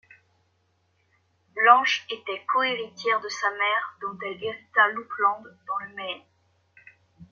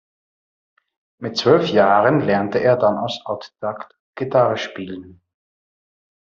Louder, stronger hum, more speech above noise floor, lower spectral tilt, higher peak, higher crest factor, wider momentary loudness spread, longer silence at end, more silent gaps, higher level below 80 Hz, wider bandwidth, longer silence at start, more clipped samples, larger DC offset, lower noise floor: second, -24 LUFS vs -18 LUFS; neither; second, 44 dB vs over 72 dB; second, -2 dB/octave vs -4.5 dB/octave; about the same, -2 dBFS vs -2 dBFS; first, 24 dB vs 18 dB; about the same, 16 LU vs 17 LU; second, 0.1 s vs 1.2 s; second, none vs 3.99-4.13 s; second, -76 dBFS vs -62 dBFS; about the same, 7.2 kHz vs 7.4 kHz; first, 1.55 s vs 1.2 s; neither; neither; second, -69 dBFS vs under -90 dBFS